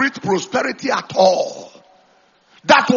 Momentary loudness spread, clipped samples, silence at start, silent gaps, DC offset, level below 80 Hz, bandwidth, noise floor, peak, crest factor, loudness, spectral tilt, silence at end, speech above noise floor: 13 LU; under 0.1%; 0 s; none; under 0.1%; -64 dBFS; 7.4 kHz; -55 dBFS; 0 dBFS; 18 dB; -17 LUFS; -2.5 dB/octave; 0 s; 39 dB